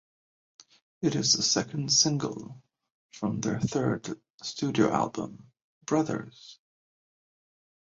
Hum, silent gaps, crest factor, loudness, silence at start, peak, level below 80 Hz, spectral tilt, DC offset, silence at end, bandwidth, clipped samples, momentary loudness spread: none; 2.92-3.09 s, 4.30-4.38 s, 5.64-5.81 s; 22 dB; -27 LUFS; 1 s; -10 dBFS; -64 dBFS; -3.5 dB/octave; under 0.1%; 1.3 s; 7.8 kHz; under 0.1%; 18 LU